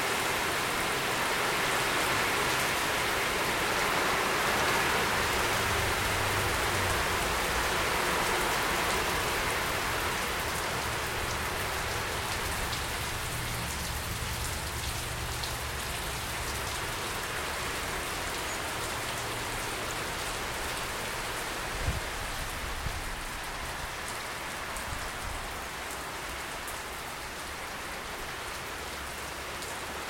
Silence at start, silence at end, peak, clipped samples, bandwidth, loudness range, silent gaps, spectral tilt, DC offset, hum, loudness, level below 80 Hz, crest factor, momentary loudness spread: 0 s; 0 s; -16 dBFS; under 0.1%; 16.5 kHz; 9 LU; none; -2.5 dB/octave; under 0.1%; none; -31 LUFS; -44 dBFS; 16 dB; 9 LU